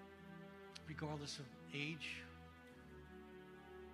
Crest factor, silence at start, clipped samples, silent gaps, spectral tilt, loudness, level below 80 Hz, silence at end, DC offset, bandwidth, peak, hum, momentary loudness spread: 22 dB; 0 s; under 0.1%; none; -4.5 dB/octave; -51 LUFS; -70 dBFS; 0 s; under 0.1%; 15 kHz; -30 dBFS; none; 14 LU